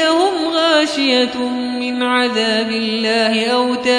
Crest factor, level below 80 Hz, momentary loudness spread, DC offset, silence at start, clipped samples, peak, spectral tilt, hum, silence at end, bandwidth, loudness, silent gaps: 14 dB; -58 dBFS; 6 LU; under 0.1%; 0 s; under 0.1%; -2 dBFS; -3 dB/octave; none; 0 s; 10.5 kHz; -15 LUFS; none